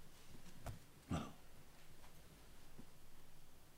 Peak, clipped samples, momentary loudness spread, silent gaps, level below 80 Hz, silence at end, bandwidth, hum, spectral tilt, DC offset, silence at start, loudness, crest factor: -32 dBFS; under 0.1%; 18 LU; none; -60 dBFS; 0 s; 16 kHz; none; -5.5 dB/octave; under 0.1%; 0 s; -55 LUFS; 22 dB